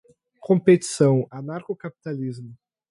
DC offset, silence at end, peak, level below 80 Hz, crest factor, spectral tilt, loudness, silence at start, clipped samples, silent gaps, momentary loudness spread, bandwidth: under 0.1%; 0.35 s; -4 dBFS; -68 dBFS; 20 dB; -6.5 dB/octave; -22 LUFS; 0.45 s; under 0.1%; none; 16 LU; 11.5 kHz